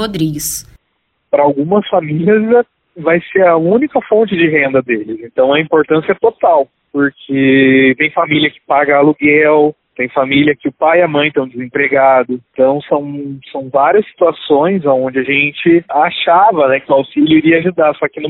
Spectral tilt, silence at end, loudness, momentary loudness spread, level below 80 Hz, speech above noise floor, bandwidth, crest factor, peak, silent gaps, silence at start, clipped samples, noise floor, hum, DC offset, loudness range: -5.5 dB/octave; 0 s; -12 LUFS; 8 LU; -50 dBFS; 53 dB; 13 kHz; 12 dB; 0 dBFS; none; 0 s; under 0.1%; -65 dBFS; none; under 0.1%; 3 LU